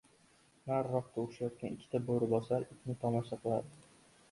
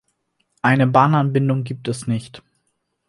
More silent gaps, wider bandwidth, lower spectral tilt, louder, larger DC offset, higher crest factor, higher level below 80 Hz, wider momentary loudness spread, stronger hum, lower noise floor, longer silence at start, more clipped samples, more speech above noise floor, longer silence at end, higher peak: neither; about the same, 11.5 kHz vs 11.5 kHz; first, -8.5 dB/octave vs -7 dB/octave; second, -37 LUFS vs -18 LUFS; neither; about the same, 18 dB vs 20 dB; second, -70 dBFS vs -60 dBFS; second, 9 LU vs 12 LU; neither; second, -67 dBFS vs -71 dBFS; about the same, 0.65 s vs 0.65 s; neither; second, 31 dB vs 54 dB; second, 0.5 s vs 0.7 s; second, -18 dBFS vs 0 dBFS